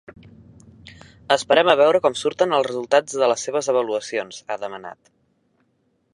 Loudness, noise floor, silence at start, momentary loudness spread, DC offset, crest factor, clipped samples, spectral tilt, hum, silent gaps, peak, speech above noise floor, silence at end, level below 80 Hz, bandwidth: -20 LUFS; -67 dBFS; 0.1 s; 14 LU; under 0.1%; 20 dB; under 0.1%; -3 dB/octave; none; none; -2 dBFS; 47 dB; 1.2 s; -62 dBFS; 11 kHz